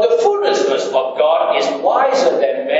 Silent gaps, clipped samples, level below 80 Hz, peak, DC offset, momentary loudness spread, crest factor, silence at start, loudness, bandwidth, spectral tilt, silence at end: none; under 0.1%; -78 dBFS; -2 dBFS; under 0.1%; 3 LU; 14 dB; 0 s; -15 LUFS; 8 kHz; -2.5 dB/octave; 0 s